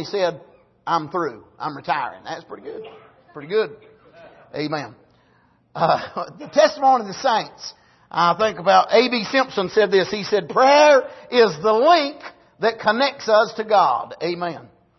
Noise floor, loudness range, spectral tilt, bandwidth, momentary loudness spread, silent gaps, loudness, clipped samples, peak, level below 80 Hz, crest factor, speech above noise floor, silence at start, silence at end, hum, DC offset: -59 dBFS; 12 LU; -4 dB/octave; 6.2 kHz; 19 LU; none; -19 LUFS; under 0.1%; -2 dBFS; -64 dBFS; 18 dB; 40 dB; 0 s; 0.35 s; none; under 0.1%